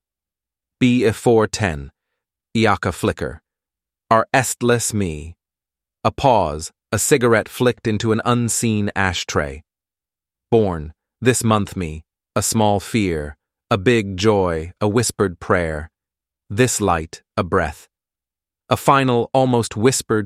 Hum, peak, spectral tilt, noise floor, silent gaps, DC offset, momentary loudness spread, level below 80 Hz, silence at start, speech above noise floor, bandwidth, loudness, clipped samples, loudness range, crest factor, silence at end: none; -2 dBFS; -5 dB/octave; under -90 dBFS; none; under 0.1%; 11 LU; -42 dBFS; 0.8 s; over 72 dB; 15.5 kHz; -19 LUFS; under 0.1%; 3 LU; 18 dB; 0 s